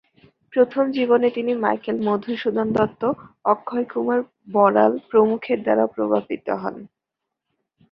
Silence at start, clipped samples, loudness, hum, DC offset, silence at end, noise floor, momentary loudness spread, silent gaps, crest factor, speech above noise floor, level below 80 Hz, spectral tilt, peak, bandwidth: 0.55 s; under 0.1%; -21 LUFS; none; under 0.1%; 1.05 s; -83 dBFS; 8 LU; none; 20 dB; 62 dB; -64 dBFS; -8.5 dB/octave; -2 dBFS; 5.6 kHz